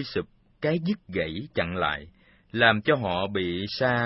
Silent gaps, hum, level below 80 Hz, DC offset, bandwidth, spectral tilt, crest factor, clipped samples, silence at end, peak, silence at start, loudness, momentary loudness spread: none; none; -54 dBFS; under 0.1%; 6 kHz; -9 dB/octave; 22 dB; under 0.1%; 0 s; -4 dBFS; 0 s; -26 LUFS; 12 LU